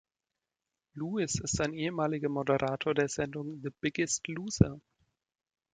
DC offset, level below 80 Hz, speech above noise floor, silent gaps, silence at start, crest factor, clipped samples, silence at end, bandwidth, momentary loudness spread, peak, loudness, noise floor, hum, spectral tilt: under 0.1%; -52 dBFS; 58 dB; none; 0.95 s; 26 dB; under 0.1%; 0.95 s; 9.6 kHz; 10 LU; -6 dBFS; -32 LUFS; -90 dBFS; none; -5 dB/octave